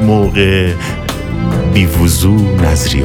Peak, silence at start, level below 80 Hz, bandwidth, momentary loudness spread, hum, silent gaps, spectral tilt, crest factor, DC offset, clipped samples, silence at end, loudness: 0 dBFS; 0 s; -22 dBFS; 18 kHz; 8 LU; none; none; -5.5 dB/octave; 10 dB; under 0.1%; under 0.1%; 0 s; -12 LUFS